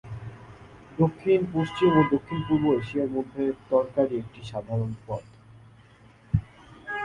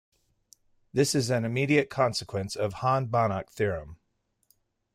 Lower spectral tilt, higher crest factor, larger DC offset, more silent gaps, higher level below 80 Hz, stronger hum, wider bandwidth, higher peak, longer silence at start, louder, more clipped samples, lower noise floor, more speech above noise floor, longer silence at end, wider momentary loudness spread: first, -8.5 dB/octave vs -5 dB/octave; about the same, 20 dB vs 18 dB; neither; neither; first, -50 dBFS vs -60 dBFS; neither; second, 10.5 kHz vs 16 kHz; about the same, -8 dBFS vs -10 dBFS; second, 0.05 s vs 0.95 s; about the same, -26 LUFS vs -27 LUFS; neither; second, -54 dBFS vs -75 dBFS; second, 29 dB vs 48 dB; second, 0 s vs 1 s; first, 16 LU vs 7 LU